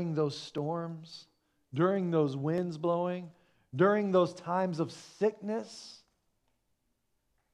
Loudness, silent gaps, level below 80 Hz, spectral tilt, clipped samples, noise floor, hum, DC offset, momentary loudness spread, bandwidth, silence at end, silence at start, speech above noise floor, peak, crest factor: -32 LUFS; none; -80 dBFS; -7 dB/octave; under 0.1%; -78 dBFS; none; under 0.1%; 18 LU; 11 kHz; 1.6 s; 0 s; 47 dB; -12 dBFS; 20 dB